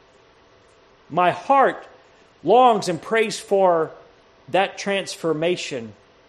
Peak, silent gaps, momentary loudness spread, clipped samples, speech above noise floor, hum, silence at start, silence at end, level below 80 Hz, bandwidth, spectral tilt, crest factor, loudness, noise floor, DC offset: -2 dBFS; none; 14 LU; under 0.1%; 34 dB; none; 1.1 s; 0.35 s; -66 dBFS; 13 kHz; -4.5 dB/octave; 20 dB; -20 LUFS; -54 dBFS; under 0.1%